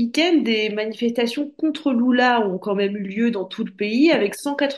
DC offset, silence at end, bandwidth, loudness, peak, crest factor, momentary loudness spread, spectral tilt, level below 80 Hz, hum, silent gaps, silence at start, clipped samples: under 0.1%; 0 s; 12.5 kHz; -20 LUFS; -6 dBFS; 16 dB; 7 LU; -5 dB/octave; -70 dBFS; none; none; 0 s; under 0.1%